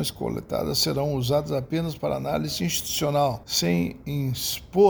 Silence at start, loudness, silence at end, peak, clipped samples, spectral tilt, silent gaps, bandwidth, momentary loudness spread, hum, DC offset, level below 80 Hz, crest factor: 0 s; -25 LUFS; 0 s; -6 dBFS; under 0.1%; -4.5 dB/octave; none; over 20 kHz; 6 LU; none; under 0.1%; -48 dBFS; 18 dB